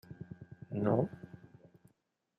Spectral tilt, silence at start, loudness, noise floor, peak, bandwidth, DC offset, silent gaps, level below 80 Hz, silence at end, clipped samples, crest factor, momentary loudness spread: -11 dB/octave; 0.1 s; -35 LUFS; -78 dBFS; -16 dBFS; 14 kHz; under 0.1%; none; -72 dBFS; 1.05 s; under 0.1%; 22 dB; 21 LU